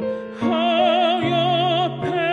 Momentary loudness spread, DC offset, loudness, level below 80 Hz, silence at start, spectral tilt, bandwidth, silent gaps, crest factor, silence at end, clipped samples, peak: 6 LU; under 0.1%; -19 LUFS; -60 dBFS; 0 s; -6.5 dB/octave; 8.2 kHz; none; 14 dB; 0 s; under 0.1%; -6 dBFS